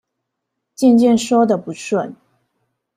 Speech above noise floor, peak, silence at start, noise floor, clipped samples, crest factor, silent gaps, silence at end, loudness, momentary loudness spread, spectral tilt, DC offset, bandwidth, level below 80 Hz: 63 dB; -2 dBFS; 0.8 s; -77 dBFS; under 0.1%; 16 dB; none; 0.85 s; -16 LUFS; 10 LU; -5.5 dB/octave; under 0.1%; 13.5 kHz; -62 dBFS